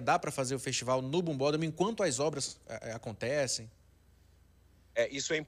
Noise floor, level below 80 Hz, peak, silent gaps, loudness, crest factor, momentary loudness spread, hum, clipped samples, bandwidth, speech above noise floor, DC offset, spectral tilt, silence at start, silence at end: -63 dBFS; -66 dBFS; -16 dBFS; none; -33 LUFS; 18 dB; 10 LU; none; under 0.1%; 15.5 kHz; 30 dB; under 0.1%; -4 dB/octave; 0 s; 0 s